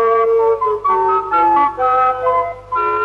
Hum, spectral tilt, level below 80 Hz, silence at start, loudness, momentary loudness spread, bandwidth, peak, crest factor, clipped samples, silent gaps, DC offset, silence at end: 50 Hz at -45 dBFS; -6.5 dB/octave; -48 dBFS; 0 s; -15 LUFS; 5 LU; 5.8 kHz; -4 dBFS; 10 dB; under 0.1%; none; under 0.1%; 0 s